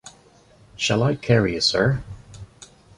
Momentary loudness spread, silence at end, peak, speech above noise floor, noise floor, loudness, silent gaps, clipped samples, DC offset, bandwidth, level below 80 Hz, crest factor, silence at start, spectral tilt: 22 LU; 0.35 s; -4 dBFS; 33 dB; -53 dBFS; -21 LUFS; none; under 0.1%; under 0.1%; 11 kHz; -46 dBFS; 20 dB; 0.05 s; -5 dB/octave